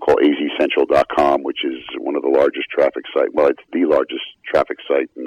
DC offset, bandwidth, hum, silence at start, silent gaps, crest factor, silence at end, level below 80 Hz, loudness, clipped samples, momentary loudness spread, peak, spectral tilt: under 0.1%; 10.5 kHz; none; 0 s; none; 12 dB; 0 s; -50 dBFS; -18 LUFS; under 0.1%; 9 LU; -4 dBFS; -5.5 dB/octave